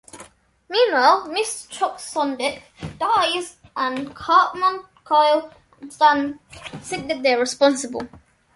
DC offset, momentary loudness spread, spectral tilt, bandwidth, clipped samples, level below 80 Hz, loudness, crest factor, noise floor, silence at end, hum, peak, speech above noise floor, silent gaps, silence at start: under 0.1%; 17 LU; -2.5 dB/octave; 11.5 kHz; under 0.1%; -58 dBFS; -20 LUFS; 18 dB; -48 dBFS; 0.4 s; none; -2 dBFS; 27 dB; none; 0.15 s